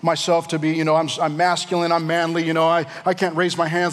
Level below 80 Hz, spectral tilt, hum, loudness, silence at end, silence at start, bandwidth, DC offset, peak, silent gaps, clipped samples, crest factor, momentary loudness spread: -78 dBFS; -4.5 dB/octave; none; -20 LUFS; 0 s; 0.05 s; 14 kHz; under 0.1%; -6 dBFS; none; under 0.1%; 14 dB; 3 LU